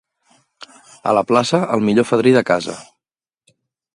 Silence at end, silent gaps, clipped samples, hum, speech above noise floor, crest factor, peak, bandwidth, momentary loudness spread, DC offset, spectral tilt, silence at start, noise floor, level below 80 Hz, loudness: 1.15 s; none; under 0.1%; none; 73 dB; 18 dB; 0 dBFS; 11.5 kHz; 12 LU; under 0.1%; -5.5 dB/octave; 1.05 s; -89 dBFS; -60 dBFS; -16 LUFS